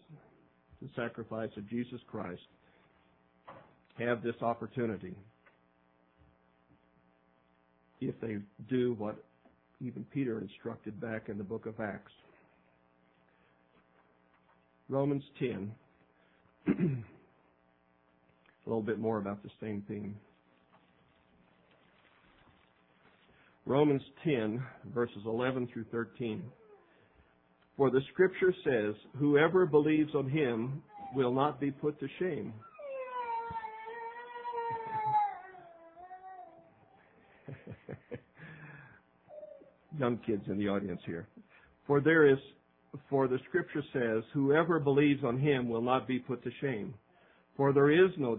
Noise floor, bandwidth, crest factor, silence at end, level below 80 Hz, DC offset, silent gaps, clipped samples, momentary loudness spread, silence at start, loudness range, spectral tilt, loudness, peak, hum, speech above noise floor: -70 dBFS; 4 kHz; 22 dB; 0 s; -72 dBFS; under 0.1%; none; under 0.1%; 23 LU; 0.1 s; 15 LU; -6 dB/octave; -33 LUFS; -12 dBFS; none; 38 dB